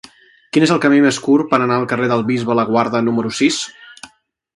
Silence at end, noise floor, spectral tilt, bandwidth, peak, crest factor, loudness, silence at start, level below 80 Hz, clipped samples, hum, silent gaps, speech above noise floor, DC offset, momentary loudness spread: 0.5 s; -53 dBFS; -5 dB/octave; 11.5 kHz; 0 dBFS; 16 dB; -15 LUFS; 0.55 s; -60 dBFS; under 0.1%; none; none; 38 dB; under 0.1%; 5 LU